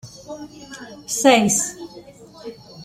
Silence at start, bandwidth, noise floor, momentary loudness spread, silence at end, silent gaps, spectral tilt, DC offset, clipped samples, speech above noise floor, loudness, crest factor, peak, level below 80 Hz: 0.05 s; 16 kHz; -43 dBFS; 23 LU; 0 s; none; -3 dB/octave; under 0.1%; under 0.1%; 23 dB; -17 LUFS; 20 dB; -2 dBFS; -60 dBFS